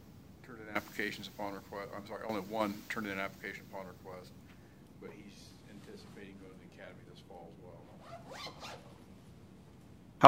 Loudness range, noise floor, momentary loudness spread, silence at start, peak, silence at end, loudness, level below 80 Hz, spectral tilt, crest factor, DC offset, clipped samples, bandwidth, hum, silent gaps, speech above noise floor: 13 LU; -57 dBFS; 19 LU; 0 s; -4 dBFS; 0 s; -44 LUFS; -68 dBFS; -5 dB/octave; 34 dB; under 0.1%; under 0.1%; 16 kHz; none; none; 15 dB